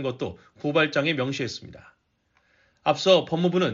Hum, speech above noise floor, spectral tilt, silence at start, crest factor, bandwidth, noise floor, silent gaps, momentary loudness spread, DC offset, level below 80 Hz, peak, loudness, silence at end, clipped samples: none; 44 dB; -3.5 dB/octave; 0 s; 20 dB; 7.6 kHz; -69 dBFS; none; 13 LU; under 0.1%; -62 dBFS; -6 dBFS; -24 LUFS; 0 s; under 0.1%